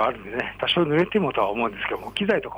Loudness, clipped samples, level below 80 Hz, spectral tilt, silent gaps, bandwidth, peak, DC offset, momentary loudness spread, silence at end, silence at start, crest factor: -24 LUFS; under 0.1%; -52 dBFS; -6.5 dB/octave; none; over 20 kHz; -10 dBFS; under 0.1%; 8 LU; 0 s; 0 s; 14 dB